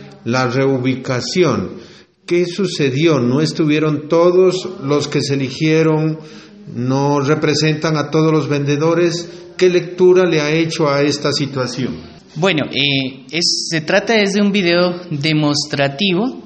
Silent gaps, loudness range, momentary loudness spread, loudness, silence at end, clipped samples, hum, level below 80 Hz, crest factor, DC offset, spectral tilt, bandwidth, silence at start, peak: none; 2 LU; 8 LU; -15 LUFS; 0 s; under 0.1%; none; -56 dBFS; 14 dB; under 0.1%; -5 dB/octave; 8.8 kHz; 0 s; 0 dBFS